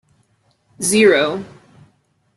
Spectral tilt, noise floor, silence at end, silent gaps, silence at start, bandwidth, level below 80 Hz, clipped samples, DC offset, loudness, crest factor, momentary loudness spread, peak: -3 dB/octave; -61 dBFS; 0.9 s; none; 0.8 s; 12.5 kHz; -60 dBFS; under 0.1%; under 0.1%; -15 LUFS; 18 dB; 18 LU; -2 dBFS